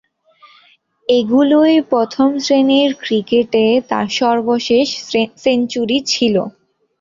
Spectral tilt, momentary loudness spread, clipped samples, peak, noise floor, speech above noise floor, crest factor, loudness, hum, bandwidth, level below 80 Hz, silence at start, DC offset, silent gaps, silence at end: -4.5 dB/octave; 6 LU; under 0.1%; -2 dBFS; -52 dBFS; 38 dB; 12 dB; -14 LUFS; none; 7.6 kHz; -58 dBFS; 1.1 s; under 0.1%; none; 0.5 s